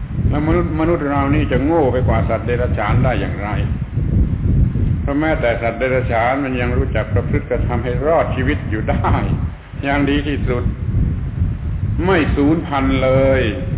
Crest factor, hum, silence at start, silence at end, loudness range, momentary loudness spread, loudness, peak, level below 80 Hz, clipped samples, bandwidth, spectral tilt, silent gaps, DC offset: 12 dB; none; 0 s; 0 s; 2 LU; 6 LU; -17 LUFS; -4 dBFS; -24 dBFS; under 0.1%; 4 kHz; -11.5 dB/octave; none; under 0.1%